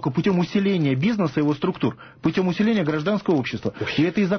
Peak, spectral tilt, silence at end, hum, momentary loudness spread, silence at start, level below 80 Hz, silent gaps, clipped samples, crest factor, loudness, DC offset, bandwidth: -10 dBFS; -7.5 dB/octave; 0 s; none; 6 LU; 0 s; -54 dBFS; none; under 0.1%; 12 dB; -22 LUFS; under 0.1%; 6.6 kHz